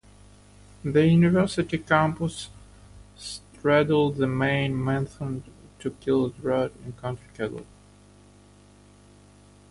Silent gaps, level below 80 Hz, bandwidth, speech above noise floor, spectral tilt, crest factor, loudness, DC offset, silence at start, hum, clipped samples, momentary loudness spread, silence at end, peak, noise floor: none; -52 dBFS; 11.5 kHz; 29 dB; -7 dB/octave; 20 dB; -25 LUFS; under 0.1%; 0.85 s; 50 Hz at -45 dBFS; under 0.1%; 17 LU; 2.1 s; -6 dBFS; -53 dBFS